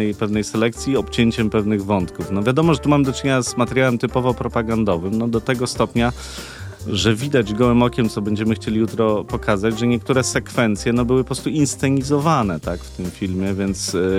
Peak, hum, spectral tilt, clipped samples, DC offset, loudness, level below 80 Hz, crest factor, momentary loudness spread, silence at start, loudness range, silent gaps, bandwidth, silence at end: -2 dBFS; none; -5.5 dB/octave; under 0.1%; under 0.1%; -19 LUFS; -38 dBFS; 16 dB; 6 LU; 0 s; 2 LU; none; 16 kHz; 0 s